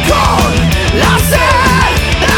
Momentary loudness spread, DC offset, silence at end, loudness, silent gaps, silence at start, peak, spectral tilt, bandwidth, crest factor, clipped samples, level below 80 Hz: 3 LU; under 0.1%; 0 s; -9 LUFS; none; 0 s; 0 dBFS; -4.5 dB/octave; 19 kHz; 10 dB; under 0.1%; -16 dBFS